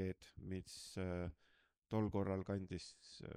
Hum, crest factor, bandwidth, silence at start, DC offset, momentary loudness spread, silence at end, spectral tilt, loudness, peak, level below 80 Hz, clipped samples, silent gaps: none; 18 dB; 13.5 kHz; 0 s; under 0.1%; 11 LU; 0 s; -6.5 dB/octave; -45 LUFS; -28 dBFS; -64 dBFS; under 0.1%; 1.78-1.82 s